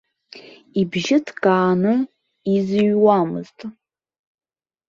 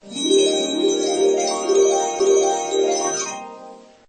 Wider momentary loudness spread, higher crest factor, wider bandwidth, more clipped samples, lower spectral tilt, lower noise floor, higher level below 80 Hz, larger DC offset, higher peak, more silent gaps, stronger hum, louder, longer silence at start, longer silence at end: first, 14 LU vs 7 LU; about the same, 18 dB vs 14 dB; second, 7.6 kHz vs 8.8 kHz; neither; first, -6.5 dB/octave vs -1.5 dB/octave; about the same, -44 dBFS vs -42 dBFS; about the same, -62 dBFS vs -66 dBFS; neither; about the same, -2 dBFS vs -4 dBFS; neither; neither; about the same, -19 LUFS vs -19 LUFS; first, 0.35 s vs 0.05 s; first, 1.15 s vs 0.25 s